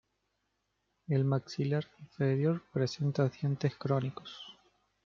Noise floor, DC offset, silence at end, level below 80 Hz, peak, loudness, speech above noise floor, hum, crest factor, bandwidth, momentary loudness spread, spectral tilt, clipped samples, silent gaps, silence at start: -81 dBFS; under 0.1%; 0.55 s; -72 dBFS; -16 dBFS; -33 LUFS; 48 dB; none; 18 dB; 7 kHz; 17 LU; -7.5 dB/octave; under 0.1%; none; 1.1 s